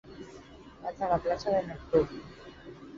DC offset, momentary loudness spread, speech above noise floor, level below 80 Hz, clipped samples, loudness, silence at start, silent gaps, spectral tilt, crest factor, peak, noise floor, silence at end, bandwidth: under 0.1%; 20 LU; 20 dB; -54 dBFS; under 0.1%; -31 LUFS; 0.05 s; none; -6.5 dB/octave; 20 dB; -12 dBFS; -50 dBFS; 0 s; 7.6 kHz